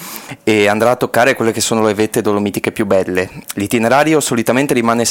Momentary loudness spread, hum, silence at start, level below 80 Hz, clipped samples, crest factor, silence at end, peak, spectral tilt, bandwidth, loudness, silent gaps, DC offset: 7 LU; none; 0 s; -52 dBFS; under 0.1%; 14 dB; 0 s; 0 dBFS; -4 dB/octave; 17 kHz; -14 LUFS; none; under 0.1%